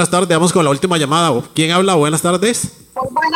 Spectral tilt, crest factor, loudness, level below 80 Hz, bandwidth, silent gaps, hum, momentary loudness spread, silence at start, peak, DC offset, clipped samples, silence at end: -4 dB/octave; 12 dB; -14 LUFS; -52 dBFS; 16.5 kHz; none; none; 8 LU; 0 s; -2 dBFS; under 0.1%; under 0.1%; 0 s